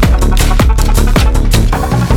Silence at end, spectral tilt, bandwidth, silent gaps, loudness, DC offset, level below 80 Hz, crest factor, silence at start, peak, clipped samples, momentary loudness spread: 0 s; -5.5 dB/octave; 17.5 kHz; none; -11 LUFS; under 0.1%; -10 dBFS; 8 dB; 0 s; 0 dBFS; under 0.1%; 2 LU